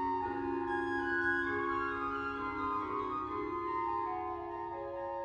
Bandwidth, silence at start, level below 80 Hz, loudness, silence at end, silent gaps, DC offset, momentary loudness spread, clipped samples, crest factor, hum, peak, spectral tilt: 8.8 kHz; 0 s; -60 dBFS; -36 LUFS; 0 s; none; under 0.1%; 8 LU; under 0.1%; 14 dB; none; -20 dBFS; -7 dB/octave